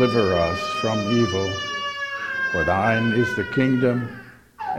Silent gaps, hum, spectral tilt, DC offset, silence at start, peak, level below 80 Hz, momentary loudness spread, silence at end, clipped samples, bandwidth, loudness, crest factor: none; none; -5.5 dB/octave; under 0.1%; 0 s; -6 dBFS; -48 dBFS; 8 LU; 0 s; under 0.1%; 13.5 kHz; -22 LUFS; 16 dB